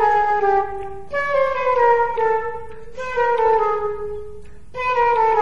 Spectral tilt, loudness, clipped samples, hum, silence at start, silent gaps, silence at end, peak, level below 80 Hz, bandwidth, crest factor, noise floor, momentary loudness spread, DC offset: -5 dB/octave; -19 LUFS; under 0.1%; none; 0 s; none; 0 s; -4 dBFS; -46 dBFS; 7.6 kHz; 14 dB; -40 dBFS; 16 LU; 2%